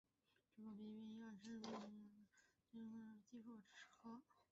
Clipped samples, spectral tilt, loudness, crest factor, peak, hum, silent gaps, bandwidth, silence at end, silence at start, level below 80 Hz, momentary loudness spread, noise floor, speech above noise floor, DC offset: under 0.1%; -5 dB/octave; -59 LUFS; 18 dB; -40 dBFS; none; none; 7.6 kHz; 0.1 s; 0.55 s; under -90 dBFS; 9 LU; -86 dBFS; 29 dB; under 0.1%